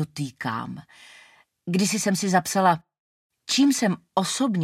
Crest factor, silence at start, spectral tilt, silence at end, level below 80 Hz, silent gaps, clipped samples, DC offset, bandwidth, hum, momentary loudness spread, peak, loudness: 20 dB; 0 s; -4 dB/octave; 0 s; -68 dBFS; 2.99-3.30 s; under 0.1%; under 0.1%; 16 kHz; none; 15 LU; -6 dBFS; -23 LUFS